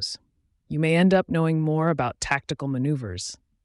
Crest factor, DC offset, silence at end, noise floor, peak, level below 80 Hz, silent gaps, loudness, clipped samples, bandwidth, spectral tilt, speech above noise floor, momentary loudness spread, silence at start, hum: 16 dB; under 0.1%; 0.3 s; -68 dBFS; -8 dBFS; -52 dBFS; none; -24 LUFS; under 0.1%; 11.5 kHz; -6 dB/octave; 45 dB; 13 LU; 0 s; none